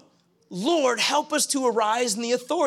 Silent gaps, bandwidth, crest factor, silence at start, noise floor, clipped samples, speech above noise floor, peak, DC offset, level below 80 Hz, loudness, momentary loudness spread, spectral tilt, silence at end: none; 16 kHz; 14 dB; 0.5 s; -61 dBFS; under 0.1%; 38 dB; -10 dBFS; under 0.1%; -82 dBFS; -23 LUFS; 5 LU; -2 dB/octave; 0 s